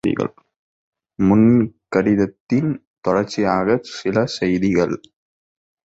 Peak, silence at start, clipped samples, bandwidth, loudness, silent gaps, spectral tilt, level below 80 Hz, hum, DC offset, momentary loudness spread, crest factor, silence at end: -2 dBFS; 0.05 s; under 0.1%; 8 kHz; -19 LUFS; 0.56-0.93 s, 2.40-2.47 s, 2.87-3.02 s; -7 dB/octave; -48 dBFS; none; under 0.1%; 10 LU; 16 dB; 1 s